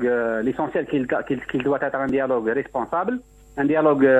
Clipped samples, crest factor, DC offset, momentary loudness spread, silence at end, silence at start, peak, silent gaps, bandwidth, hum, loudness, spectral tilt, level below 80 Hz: under 0.1%; 14 dB; under 0.1%; 7 LU; 0 s; 0 s; -6 dBFS; none; 8.4 kHz; none; -23 LUFS; -8 dB/octave; -54 dBFS